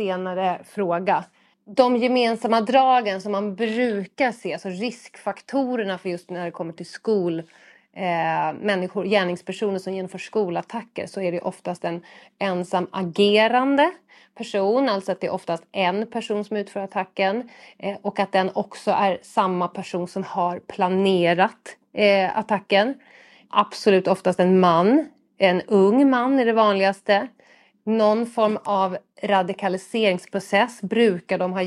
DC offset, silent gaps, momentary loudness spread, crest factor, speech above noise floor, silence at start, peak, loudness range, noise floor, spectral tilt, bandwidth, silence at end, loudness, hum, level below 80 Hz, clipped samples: under 0.1%; none; 12 LU; 20 dB; 34 dB; 0 s; -2 dBFS; 7 LU; -56 dBFS; -6 dB/octave; 12 kHz; 0 s; -22 LUFS; none; -74 dBFS; under 0.1%